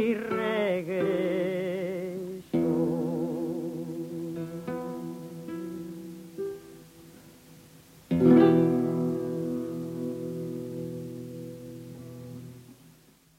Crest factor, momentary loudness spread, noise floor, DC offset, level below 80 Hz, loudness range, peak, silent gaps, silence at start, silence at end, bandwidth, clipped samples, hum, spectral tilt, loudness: 22 dB; 19 LU; -58 dBFS; under 0.1%; -64 dBFS; 13 LU; -8 dBFS; none; 0 s; 0.45 s; 16 kHz; under 0.1%; none; -8 dB/octave; -29 LUFS